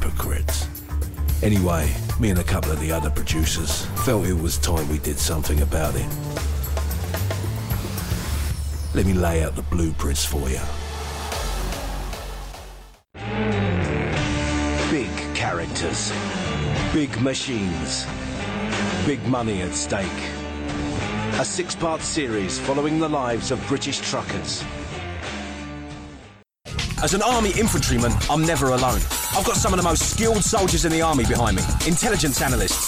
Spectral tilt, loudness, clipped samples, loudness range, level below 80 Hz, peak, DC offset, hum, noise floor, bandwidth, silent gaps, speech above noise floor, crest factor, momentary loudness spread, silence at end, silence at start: -4.5 dB/octave; -23 LUFS; under 0.1%; 7 LU; -30 dBFS; -8 dBFS; under 0.1%; none; -46 dBFS; 16.5 kHz; none; 25 dB; 14 dB; 10 LU; 0 s; 0 s